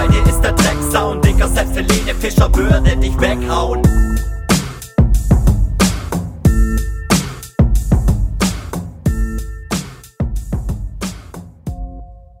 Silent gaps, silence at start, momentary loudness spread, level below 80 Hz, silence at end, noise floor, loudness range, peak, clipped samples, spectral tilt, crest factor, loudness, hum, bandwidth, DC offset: none; 0 s; 13 LU; -18 dBFS; 0.25 s; -34 dBFS; 8 LU; 0 dBFS; under 0.1%; -5.5 dB/octave; 14 dB; -16 LUFS; none; 19 kHz; under 0.1%